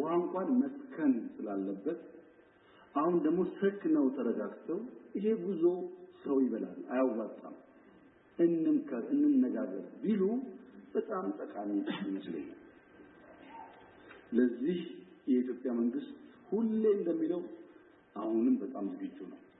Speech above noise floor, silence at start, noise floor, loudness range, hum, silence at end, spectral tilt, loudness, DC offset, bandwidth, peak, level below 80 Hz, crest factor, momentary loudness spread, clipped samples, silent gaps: 29 dB; 0 s; -62 dBFS; 5 LU; none; 0.2 s; -10.5 dB/octave; -34 LUFS; under 0.1%; 4 kHz; -16 dBFS; -80 dBFS; 18 dB; 17 LU; under 0.1%; none